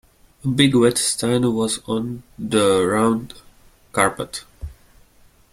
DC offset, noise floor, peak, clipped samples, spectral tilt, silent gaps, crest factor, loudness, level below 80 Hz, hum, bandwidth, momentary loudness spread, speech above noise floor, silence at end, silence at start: under 0.1%; -53 dBFS; -2 dBFS; under 0.1%; -4.5 dB/octave; none; 20 dB; -19 LUFS; -48 dBFS; none; 16 kHz; 16 LU; 34 dB; 0.8 s; 0.45 s